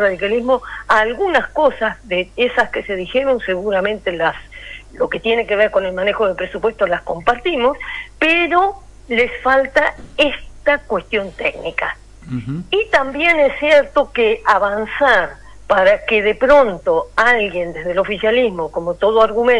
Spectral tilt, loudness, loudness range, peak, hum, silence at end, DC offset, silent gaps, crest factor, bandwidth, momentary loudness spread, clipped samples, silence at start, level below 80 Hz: -5 dB/octave; -16 LUFS; 4 LU; -2 dBFS; none; 0 s; under 0.1%; none; 14 dB; 11 kHz; 9 LU; under 0.1%; 0 s; -40 dBFS